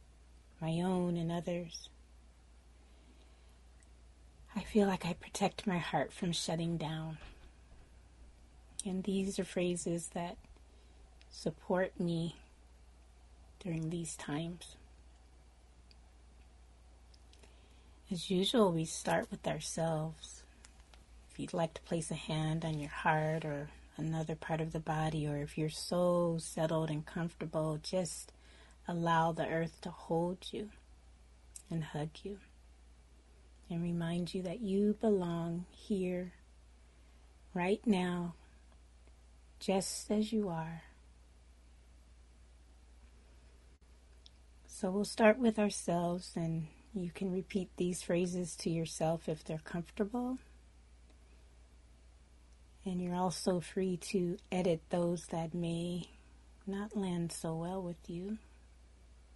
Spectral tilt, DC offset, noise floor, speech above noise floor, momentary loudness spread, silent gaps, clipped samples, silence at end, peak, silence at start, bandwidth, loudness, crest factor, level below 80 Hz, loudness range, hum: -5.5 dB/octave; under 0.1%; -61 dBFS; 25 dB; 13 LU; none; under 0.1%; 0 s; -14 dBFS; 0 s; 11.5 kHz; -37 LUFS; 24 dB; -60 dBFS; 9 LU; none